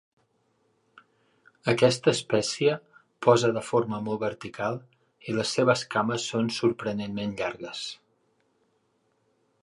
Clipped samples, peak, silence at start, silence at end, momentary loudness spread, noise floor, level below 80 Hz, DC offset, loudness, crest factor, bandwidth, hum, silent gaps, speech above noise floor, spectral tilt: under 0.1%; -6 dBFS; 1.65 s; 1.7 s; 13 LU; -71 dBFS; -66 dBFS; under 0.1%; -27 LUFS; 22 dB; 11.5 kHz; none; none; 45 dB; -5 dB/octave